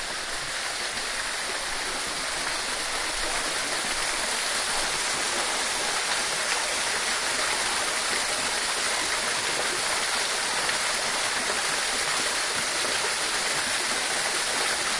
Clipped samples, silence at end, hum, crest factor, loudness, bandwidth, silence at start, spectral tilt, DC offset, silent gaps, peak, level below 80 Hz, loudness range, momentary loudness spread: under 0.1%; 0 s; none; 18 dB; -25 LUFS; 11.5 kHz; 0 s; 0.5 dB/octave; under 0.1%; none; -10 dBFS; -50 dBFS; 2 LU; 4 LU